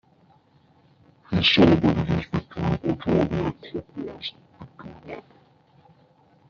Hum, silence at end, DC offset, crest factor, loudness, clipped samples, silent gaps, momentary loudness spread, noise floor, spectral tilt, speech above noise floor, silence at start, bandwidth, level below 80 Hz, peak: none; 1.3 s; under 0.1%; 22 dB; -23 LUFS; under 0.1%; none; 24 LU; -59 dBFS; -4.5 dB/octave; 37 dB; 1.3 s; 7 kHz; -48 dBFS; -4 dBFS